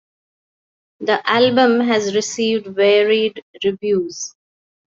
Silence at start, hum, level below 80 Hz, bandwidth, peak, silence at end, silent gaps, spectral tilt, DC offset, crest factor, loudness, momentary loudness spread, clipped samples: 1 s; none; -64 dBFS; 7.8 kHz; -2 dBFS; 0.65 s; 3.42-3.54 s; -3.5 dB/octave; under 0.1%; 18 dB; -17 LUFS; 11 LU; under 0.1%